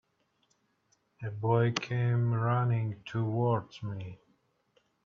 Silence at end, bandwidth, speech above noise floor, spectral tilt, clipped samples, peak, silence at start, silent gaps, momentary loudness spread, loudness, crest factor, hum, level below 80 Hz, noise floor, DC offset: 0.9 s; 7 kHz; 44 dB; -7 dB/octave; under 0.1%; -12 dBFS; 1.2 s; none; 13 LU; -31 LUFS; 20 dB; none; -68 dBFS; -74 dBFS; under 0.1%